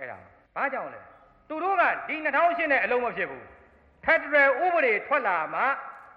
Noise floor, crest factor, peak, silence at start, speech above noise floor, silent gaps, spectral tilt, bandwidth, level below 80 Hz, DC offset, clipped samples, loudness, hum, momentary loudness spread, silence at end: -56 dBFS; 16 dB; -10 dBFS; 0 s; 31 dB; none; -6 dB/octave; 6 kHz; -64 dBFS; under 0.1%; under 0.1%; -25 LUFS; none; 14 LU; 0.1 s